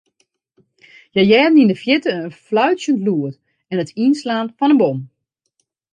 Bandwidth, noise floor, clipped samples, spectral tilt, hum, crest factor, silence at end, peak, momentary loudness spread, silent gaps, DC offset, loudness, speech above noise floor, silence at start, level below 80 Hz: 9.6 kHz; -70 dBFS; under 0.1%; -6 dB/octave; none; 16 dB; 0.9 s; 0 dBFS; 12 LU; none; under 0.1%; -16 LUFS; 55 dB; 1.15 s; -64 dBFS